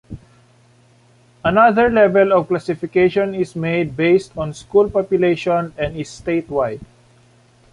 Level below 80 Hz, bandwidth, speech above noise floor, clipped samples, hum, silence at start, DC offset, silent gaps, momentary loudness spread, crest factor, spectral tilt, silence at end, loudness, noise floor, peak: -46 dBFS; 11 kHz; 36 dB; under 0.1%; none; 0.1 s; under 0.1%; none; 12 LU; 16 dB; -7 dB/octave; 0.9 s; -17 LUFS; -52 dBFS; -2 dBFS